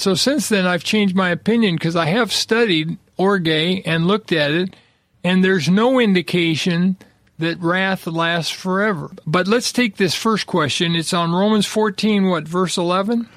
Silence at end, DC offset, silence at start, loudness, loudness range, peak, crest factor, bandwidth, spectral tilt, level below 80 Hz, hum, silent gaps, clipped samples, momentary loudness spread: 0.1 s; under 0.1%; 0 s; -18 LUFS; 2 LU; -2 dBFS; 16 dB; 15 kHz; -5 dB/octave; -58 dBFS; none; none; under 0.1%; 5 LU